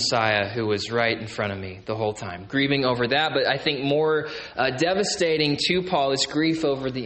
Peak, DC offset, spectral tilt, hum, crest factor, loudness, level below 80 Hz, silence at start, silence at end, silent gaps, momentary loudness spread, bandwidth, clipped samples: -6 dBFS; under 0.1%; -4 dB/octave; none; 18 dB; -23 LUFS; -56 dBFS; 0 s; 0 s; none; 7 LU; 8.8 kHz; under 0.1%